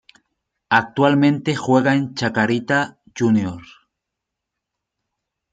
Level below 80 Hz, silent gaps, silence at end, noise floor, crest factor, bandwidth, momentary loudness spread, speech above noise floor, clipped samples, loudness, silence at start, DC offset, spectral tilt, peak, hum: -62 dBFS; none; 1.9 s; -82 dBFS; 20 dB; 9.2 kHz; 7 LU; 64 dB; under 0.1%; -19 LUFS; 0.7 s; under 0.1%; -6 dB/octave; -2 dBFS; none